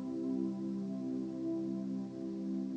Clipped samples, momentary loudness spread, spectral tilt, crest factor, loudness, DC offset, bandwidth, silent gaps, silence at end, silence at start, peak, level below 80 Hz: under 0.1%; 4 LU; -9 dB/octave; 12 dB; -39 LUFS; under 0.1%; 8.4 kHz; none; 0 s; 0 s; -26 dBFS; -76 dBFS